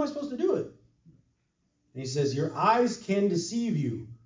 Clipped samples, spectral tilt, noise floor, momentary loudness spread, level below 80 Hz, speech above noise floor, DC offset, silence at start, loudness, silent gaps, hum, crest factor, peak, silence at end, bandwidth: under 0.1%; -6 dB/octave; -75 dBFS; 10 LU; -68 dBFS; 47 dB; under 0.1%; 0 s; -28 LUFS; none; none; 18 dB; -12 dBFS; 0.1 s; 7.6 kHz